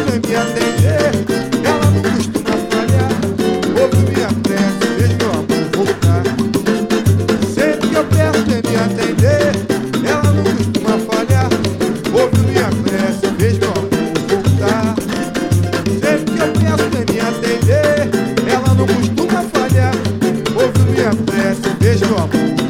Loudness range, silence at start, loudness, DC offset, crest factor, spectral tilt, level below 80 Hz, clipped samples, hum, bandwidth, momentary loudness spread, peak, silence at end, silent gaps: 1 LU; 0 s; -15 LUFS; under 0.1%; 14 dB; -6 dB/octave; -42 dBFS; under 0.1%; none; 16 kHz; 4 LU; 0 dBFS; 0 s; none